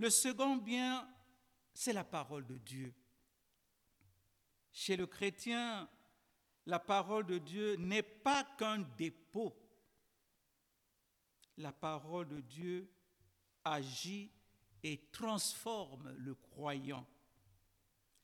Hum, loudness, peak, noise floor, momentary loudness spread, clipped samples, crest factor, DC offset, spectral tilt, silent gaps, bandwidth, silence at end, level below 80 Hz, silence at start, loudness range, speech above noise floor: none; -41 LUFS; -18 dBFS; -81 dBFS; 14 LU; under 0.1%; 24 dB; under 0.1%; -3 dB/octave; none; 19 kHz; 1.2 s; -80 dBFS; 0 s; 10 LU; 41 dB